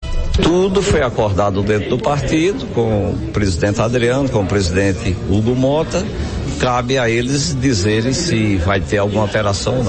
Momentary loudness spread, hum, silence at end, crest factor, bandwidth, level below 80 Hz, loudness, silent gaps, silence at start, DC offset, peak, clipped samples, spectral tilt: 4 LU; none; 0 s; 12 dB; 8.8 kHz; -28 dBFS; -16 LUFS; none; 0 s; under 0.1%; -2 dBFS; under 0.1%; -5.5 dB/octave